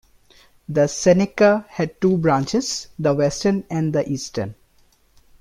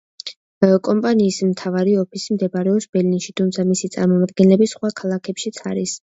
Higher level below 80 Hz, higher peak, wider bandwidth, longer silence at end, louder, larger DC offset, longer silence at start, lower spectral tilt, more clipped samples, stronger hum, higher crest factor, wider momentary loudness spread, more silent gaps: first, -52 dBFS vs -62 dBFS; second, -4 dBFS vs 0 dBFS; first, 13.5 kHz vs 8 kHz; first, 0.85 s vs 0.15 s; about the same, -20 LUFS vs -18 LUFS; neither; first, 0.7 s vs 0.25 s; about the same, -5.5 dB/octave vs -6 dB/octave; neither; neither; about the same, 18 dB vs 18 dB; about the same, 10 LU vs 10 LU; second, none vs 0.36-0.61 s, 2.89-2.93 s